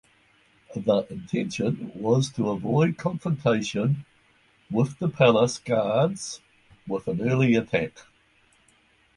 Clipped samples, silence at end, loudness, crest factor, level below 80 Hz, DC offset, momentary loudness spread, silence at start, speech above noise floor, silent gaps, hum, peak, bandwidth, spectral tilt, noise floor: under 0.1%; 1.15 s; -25 LUFS; 22 dB; -58 dBFS; under 0.1%; 10 LU; 0.7 s; 38 dB; none; none; -4 dBFS; 11.5 kHz; -6.5 dB/octave; -62 dBFS